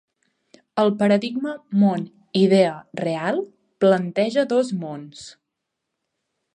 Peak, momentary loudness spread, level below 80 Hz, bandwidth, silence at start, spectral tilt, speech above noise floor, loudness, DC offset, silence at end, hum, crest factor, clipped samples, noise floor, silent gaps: -4 dBFS; 16 LU; -70 dBFS; 9.8 kHz; 0.75 s; -6.5 dB/octave; 60 dB; -21 LUFS; under 0.1%; 1.25 s; none; 18 dB; under 0.1%; -80 dBFS; none